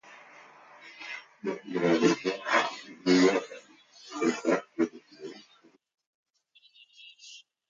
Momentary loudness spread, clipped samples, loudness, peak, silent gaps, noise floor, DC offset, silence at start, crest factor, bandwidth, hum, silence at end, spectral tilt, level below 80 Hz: 25 LU; under 0.1%; -28 LUFS; -10 dBFS; 6.07-6.23 s; -64 dBFS; under 0.1%; 0.1 s; 22 dB; 7.6 kHz; none; 0.3 s; -4.5 dB/octave; -78 dBFS